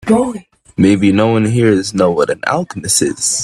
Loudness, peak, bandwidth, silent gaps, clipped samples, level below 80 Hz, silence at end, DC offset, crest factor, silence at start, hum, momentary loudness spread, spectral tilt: -13 LUFS; 0 dBFS; 14.5 kHz; none; under 0.1%; -48 dBFS; 0 s; under 0.1%; 14 dB; 0.05 s; none; 7 LU; -4.5 dB/octave